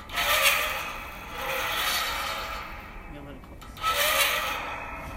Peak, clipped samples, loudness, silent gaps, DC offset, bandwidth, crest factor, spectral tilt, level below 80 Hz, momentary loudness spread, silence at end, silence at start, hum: -6 dBFS; under 0.1%; -26 LUFS; none; under 0.1%; 16 kHz; 22 dB; -0.5 dB/octave; -46 dBFS; 21 LU; 0 s; 0 s; none